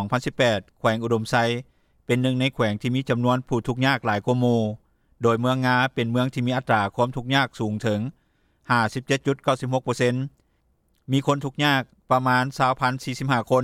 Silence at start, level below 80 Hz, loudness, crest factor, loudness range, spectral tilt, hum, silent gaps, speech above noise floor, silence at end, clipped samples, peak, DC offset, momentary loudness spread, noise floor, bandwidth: 0 s; -56 dBFS; -23 LUFS; 16 dB; 2 LU; -6 dB/octave; none; none; 44 dB; 0 s; under 0.1%; -6 dBFS; under 0.1%; 5 LU; -66 dBFS; 14.5 kHz